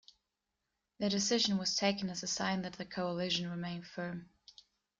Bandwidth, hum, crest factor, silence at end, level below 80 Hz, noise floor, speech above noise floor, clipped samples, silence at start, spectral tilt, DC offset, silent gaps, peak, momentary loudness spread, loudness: 9.4 kHz; none; 20 dB; 0.75 s; -72 dBFS; -87 dBFS; 51 dB; under 0.1%; 1 s; -3.5 dB/octave; under 0.1%; none; -16 dBFS; 12 LU; -35 LUFS